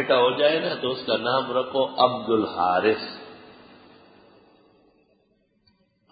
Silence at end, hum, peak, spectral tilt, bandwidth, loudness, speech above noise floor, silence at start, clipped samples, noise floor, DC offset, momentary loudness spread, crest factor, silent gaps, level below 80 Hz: 2.6 s; none; -4 dBFS; -9 dB/octave; 5 kHz; -23 LUFS; 44 dB; 0 s; under 0.1%; -67 dBFS; under 0.1%; 9 LU; 22 dB; none; -66 dBFS